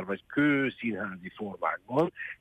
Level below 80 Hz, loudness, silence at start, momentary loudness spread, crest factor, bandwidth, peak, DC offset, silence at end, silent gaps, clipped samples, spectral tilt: -70 dBFS; -30 LUFS; 0 s; 12 LU; 18 dB; 8.6 kHz; -12 dBFS; under 0.1%; 0.05 s; none; under 0.1%; -8 dB/octave